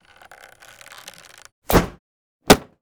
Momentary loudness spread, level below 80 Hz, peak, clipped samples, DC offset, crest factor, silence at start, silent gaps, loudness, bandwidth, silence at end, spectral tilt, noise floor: 25 LU; -36 dBFS; 0 dBFS; under 0.1%; under 0.1%; 24 dB; 1.7 s; 1.99-2.40 s; -19 LUFS; over 20 kHz; 0.2 s; -4 dB/octave; -47 dBFS